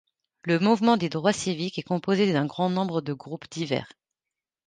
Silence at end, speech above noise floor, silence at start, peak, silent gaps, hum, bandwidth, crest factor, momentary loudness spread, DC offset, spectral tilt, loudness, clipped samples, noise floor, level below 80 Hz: 0.8 s; 64 dB; 0.45 s; -8 dBFS; none; none; 9.6 kHz; 18 dB; 12 LU; under 0.1%; -5.5 dB/octave; -25 LUFS; under 0.1%; -89 dBFS; -66 dBFS